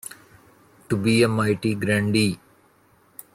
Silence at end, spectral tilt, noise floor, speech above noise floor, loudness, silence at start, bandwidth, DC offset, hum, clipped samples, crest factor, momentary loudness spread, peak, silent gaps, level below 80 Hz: 1 s; -5.5 dB/octave; -58 dBFS; 38 dB; -22 LUFS; 0.05 s; 16 kHz; under 0.1%; none; under 0.1%; 18 dB; 19 LU; -6 dBFS; none; -56 dBFS